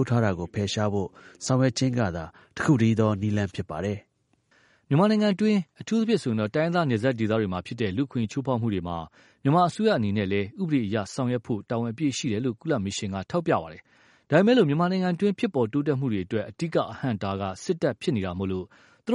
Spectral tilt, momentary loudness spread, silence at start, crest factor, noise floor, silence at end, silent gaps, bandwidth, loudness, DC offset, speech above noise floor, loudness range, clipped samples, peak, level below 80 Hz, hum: -6.5 dB/octave; 9 LU; 0 s; 20 dB; -67 dBFS; 0 s; none; 11 kHz; -26 LUFS; under 0.1%; 42 dB; 3 LU; under 0.1%; -6 dBFS; -58 dBFS; none